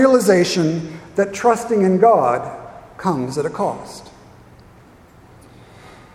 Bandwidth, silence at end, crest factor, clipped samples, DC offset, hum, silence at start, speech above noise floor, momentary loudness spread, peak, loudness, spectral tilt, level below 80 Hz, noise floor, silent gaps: 15.5 kHz; 2.05 s; 18 dB; under 0.1%; under 0.1%; none; 0 s; 30 dB; 19 LU; -2 dBFS; -17 LUFS; -5.5 dB/octave; -54 dBFS; -46 dBFS; none